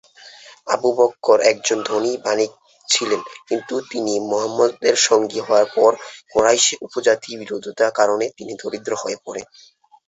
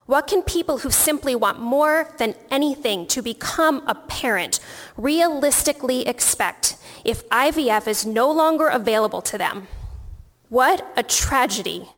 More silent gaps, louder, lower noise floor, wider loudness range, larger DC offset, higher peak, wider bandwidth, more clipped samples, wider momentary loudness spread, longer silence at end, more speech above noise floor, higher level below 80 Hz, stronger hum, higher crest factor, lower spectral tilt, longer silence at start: neither; about the same, -19 LUFS vs -20 LUFS; first, -44 dBFS vs -40 dBFS; about the same, 4 LU vs 2 LU; neither; about the same, -2 dBFS vs -2 dBFS; second, 8.2 kHz vs 17.5 kHz; neither; first, 13 LU vs 8 LU; first, 0.65 s vs 0.05 s; first, 25 dB vs 20 dB; second, -62 dBFS vs -42 dBFS; neither; about the same, 18 dB vs 18 dB; about the same, -1.5 dB/octave vs -2.5 dB/octave; first, 0.25 s vs 0.1 s